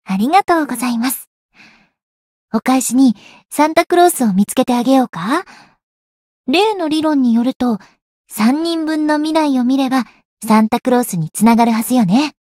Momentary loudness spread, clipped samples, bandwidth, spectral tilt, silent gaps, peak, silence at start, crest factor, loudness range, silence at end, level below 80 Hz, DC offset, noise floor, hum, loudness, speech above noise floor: 8 LU; under 0.1%; 16.5 kHz; -5 dB/octave; 1.27-1.49 s, 2.03-2.48 s, 5.83-6.44 s, 7.56-7.60 s, 8.02-8.24 s, 10.25-10.37 s; 0 dBFS; 0.1 s; 14 dB; 3 LU; 0.15 s; -58 dBFS; under 0.1%; -48 dBFS; none; -15 LUFS; 34 dB